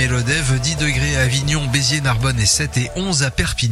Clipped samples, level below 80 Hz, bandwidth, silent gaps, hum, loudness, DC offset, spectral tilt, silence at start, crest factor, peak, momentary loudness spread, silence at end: under 0.1%; -30 dBFS; 14.5 kHz; none; none; -17 LUFS; under 0.1%; -3.5 dB/octave; 0 s; 16 dB; 0 dBFS; 4 LU; 0 s